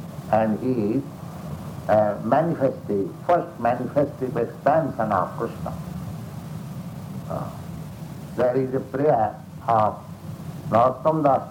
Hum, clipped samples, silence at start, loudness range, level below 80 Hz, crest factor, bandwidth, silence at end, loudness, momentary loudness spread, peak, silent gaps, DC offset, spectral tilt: none; under 0.1%; 0 s; 7 LU; -52 dBFS; 18 dB; 18 kHz; 0 s; -23 LUFS; 15 LU; -6 dBFS; none; under 0.1%; -8 dB/octave